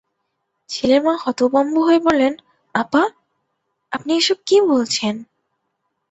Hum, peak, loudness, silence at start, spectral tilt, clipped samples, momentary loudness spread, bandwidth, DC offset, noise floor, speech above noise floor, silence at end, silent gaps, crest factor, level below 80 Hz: none; 0 dBFS; -17 LUFS; 0.7 s; -3.5 dB/octave; under 0.1%; 12 LU; 8.4 kHz; under 0.1%; -73 dBFS; 57 dB; 0.9 s; none; 18 dB; -60 dBFS